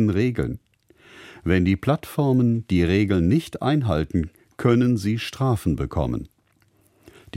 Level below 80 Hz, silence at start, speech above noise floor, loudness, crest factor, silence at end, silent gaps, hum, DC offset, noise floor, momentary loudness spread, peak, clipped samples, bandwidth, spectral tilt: -40 dBFS; 0 s; 41 dB; -22 LUFS; 16 dB; 0 s; none; none; under 0.1%; -62 dBFS; 8 LU; -6 dBFS; under 0.1%; 16 kHz; -7.5 dB/octave